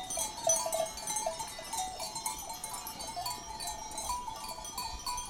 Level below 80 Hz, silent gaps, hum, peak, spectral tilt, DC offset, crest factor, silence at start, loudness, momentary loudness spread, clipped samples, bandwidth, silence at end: -54 dBFS; none; none; -14 dBFS; -0.5 dB/octave; under 0.1%; 22 dB; 0 s; -35 LUFS; 10 LU; under 0.1%; 19.5 kHz; 0 s